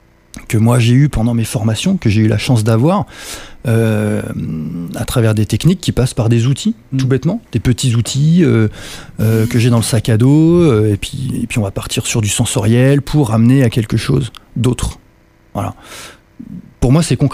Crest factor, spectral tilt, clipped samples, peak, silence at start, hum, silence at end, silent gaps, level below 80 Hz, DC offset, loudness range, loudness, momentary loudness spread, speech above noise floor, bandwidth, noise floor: 12 dB; -6 dB/octave; under 0.1%; 0 dBFS; 0.35 s; none; 0 s; none; -32 dBFS; under 0.1%; 4 LU; -14 LUFS; 13 LU; 35 dB; 16 kHz; -48 dBFS